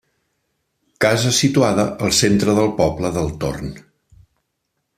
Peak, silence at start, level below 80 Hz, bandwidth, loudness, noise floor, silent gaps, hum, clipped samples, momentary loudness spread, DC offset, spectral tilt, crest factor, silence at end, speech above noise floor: -2 dBFS; 1 s; -44 dBFS; 15 kHz; -17 LUFS; -74 dBFS; none; none; under 0.1%; 10 LU; under 0.1%; -4.5 dB/octave; 18 dB; 1.2 s; 56 dB